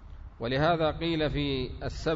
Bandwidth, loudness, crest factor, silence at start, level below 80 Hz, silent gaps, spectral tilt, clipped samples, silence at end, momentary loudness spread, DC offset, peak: 7.8 kHz; -29 LUFS; 16 dB; 0 s; -42 dBFS; none; -6.5 dB/octave; under 0.1%; 0 s; 11 LU; under 0.1%; -14 dBFS